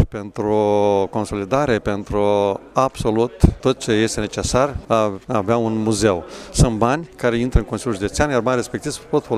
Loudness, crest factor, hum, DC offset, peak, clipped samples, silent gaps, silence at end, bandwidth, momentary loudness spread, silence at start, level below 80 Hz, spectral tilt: -19 LUFS; 18 dB; none; under 0.1%; 0 dBFS; under 0.1%; none; 0 s; 14.5 kHz; 6 LU; 0 s; -30 dBFS; -5.5 dB/octave